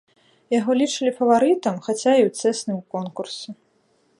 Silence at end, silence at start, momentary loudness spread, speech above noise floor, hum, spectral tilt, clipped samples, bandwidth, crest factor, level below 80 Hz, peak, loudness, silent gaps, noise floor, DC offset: 0.65 s; 0.5 s; 13 LU; 43 dB; none; -4.5 dB/octave; under 0.1%; 11.5 kHz; 18 dB; -72 dBFS; -4 dBFS; -21 LUFS; none; -63 dBFS; under 0.1%